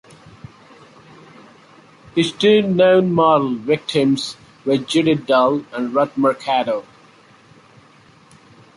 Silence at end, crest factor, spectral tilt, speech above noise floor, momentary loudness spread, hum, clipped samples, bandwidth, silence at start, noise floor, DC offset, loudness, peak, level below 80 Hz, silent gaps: 1.95 s; 18 dB; -6 dB/octave; 33 dB; 9 LU; none; under 0.1%; 11.5 kHz; 2.15 s; -49 dBFS; under 0.1%; -17 LUFS; -2 dBFS; -60 dBFS; none